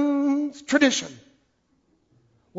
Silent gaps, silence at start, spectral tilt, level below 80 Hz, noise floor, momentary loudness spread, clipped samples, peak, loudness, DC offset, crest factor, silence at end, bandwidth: none; 0 s; -2.5 dB/octave; -68 dBFS; -68 dBFS; 8 LU; under 0.1%; -6 dBFS; -22 LUFS; under 0.1%; 20 dB; 1.45 s; 8 kHz